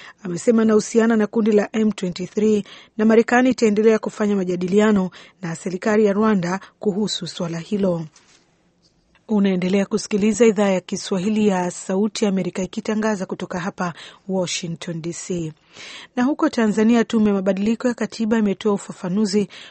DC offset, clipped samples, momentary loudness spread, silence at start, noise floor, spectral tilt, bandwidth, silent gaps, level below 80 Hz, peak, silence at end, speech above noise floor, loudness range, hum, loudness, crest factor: under 0.1%; under 0.1%; 12 LU; 0 s; -60 dBFS; -5.5 dB/octave; 8.8 kHz; none; -58 dBFS; -2 dBFS; 0 s; 41 dB; 6 LU; none; -20 LUFS; 18 dB